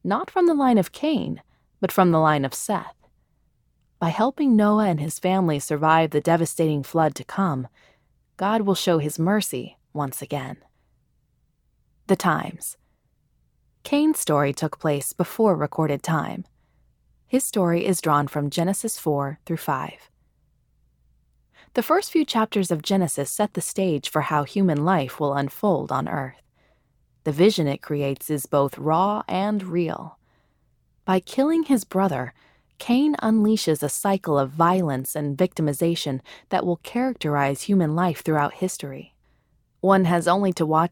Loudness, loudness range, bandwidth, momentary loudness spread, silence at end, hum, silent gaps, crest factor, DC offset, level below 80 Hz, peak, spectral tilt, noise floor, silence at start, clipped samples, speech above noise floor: -23 LUFS; 5 LU; 19.5 kHz; 10 LU; 0.05 s; none; none; 20 dB; under 0.1%; -62 dBFS; -4 dBFS; -5.5 dB/octave; -67 dBFS; 0.05 s; under 0.1%; 45 dB